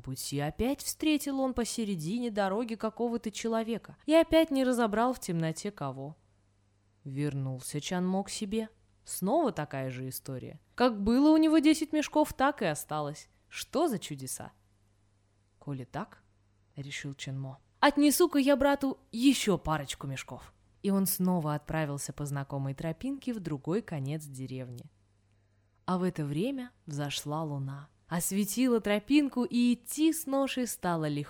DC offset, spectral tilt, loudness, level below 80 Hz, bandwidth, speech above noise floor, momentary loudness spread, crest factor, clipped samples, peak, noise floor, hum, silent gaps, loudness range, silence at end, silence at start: under 0.1%; -5 dB/octave; -30 LUFS; -56 dBFS; over 20 kHz; 39 dB; 15 LU; 20 dB; under 0.1%; -10 dBFS; -69 dBFS; 50 Hz at -65 dBFS; none; 9 LU; 0 s; 0.05 s